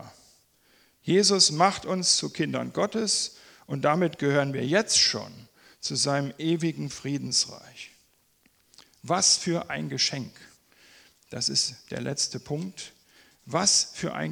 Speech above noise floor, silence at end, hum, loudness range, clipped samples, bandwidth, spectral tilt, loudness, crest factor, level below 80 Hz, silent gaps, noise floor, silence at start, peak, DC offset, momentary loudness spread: 39 dB; 0 s; none; 5 LU; under 0.1%; 19.5 kHz; -2.5 dB/octave; -25 LUFS; 22 dB; -66 dBFS; none; -65 dBFS; 0 s; -6 dBFS; under 0.1%; 16 LU